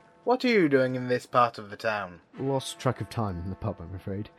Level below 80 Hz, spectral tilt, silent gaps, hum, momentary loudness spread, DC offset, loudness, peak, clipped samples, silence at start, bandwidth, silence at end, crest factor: -56 dBFS; -6 dB/octave; none; none; 13 LU; under 0.1%; -28 LUFS; -8 dBFS; under 0.1%; 0.25 s; 13.5 kHz; 0.1 s; 20 dB